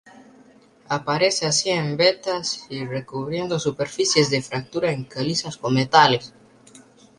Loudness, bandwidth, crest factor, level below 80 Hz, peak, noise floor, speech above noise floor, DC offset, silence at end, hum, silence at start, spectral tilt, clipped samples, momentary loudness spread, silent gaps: -21 LUFS; 11.5 kHz; 22 dB; -60 dBFS; -2 dBFS; -52 dBFS; 30 dB; under 0.1%; 0.4 s; none; 0.15 s; -3.5 dB/octave; under 0.1%; 11 LU; none